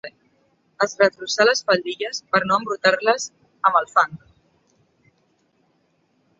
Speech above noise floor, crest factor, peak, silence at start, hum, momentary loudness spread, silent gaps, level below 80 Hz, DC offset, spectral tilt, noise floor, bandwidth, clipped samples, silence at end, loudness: 45 dB; 22 dB; 0 dBFS; 0.05 s; none; 8 LU; none; -68 dBFS; under 0.1%; -2.5 dB/octave; -65 dBFS; 8.2 kHz; under 0.1%; 2.25 s; -20 LUFS